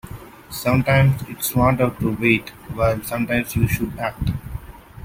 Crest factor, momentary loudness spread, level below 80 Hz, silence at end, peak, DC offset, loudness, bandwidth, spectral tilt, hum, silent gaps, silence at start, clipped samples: 18 dB; 17 LU; -38 dBFS; 0 s; -2 dBFS; under 0.1%; -20 LUFS; 16.5 kHz; -6 dB/octave; none; none; 0.05 s; under 0.1%